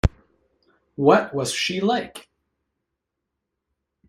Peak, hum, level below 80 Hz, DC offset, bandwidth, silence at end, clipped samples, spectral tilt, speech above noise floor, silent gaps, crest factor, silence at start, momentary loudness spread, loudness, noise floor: 0 dBFS; none; -38 dBFS; under 0.1%; 15 kHz; 1.9 s; under 0.1%; -5 dB/octave; 61 dB; none; 24 dB; 0.05 s; 22 LU; -21 LUFS; -81 dBFS